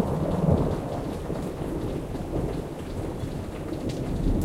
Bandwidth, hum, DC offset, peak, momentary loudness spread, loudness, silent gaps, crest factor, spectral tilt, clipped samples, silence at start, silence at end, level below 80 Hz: 16 kHz; none; under 0.1%; -8 dBFS; 10 LU; -29 LUFS; none; 18 dB; -8 dB/octave; under 0.1%; 0 s; 0 s; -36 dBFS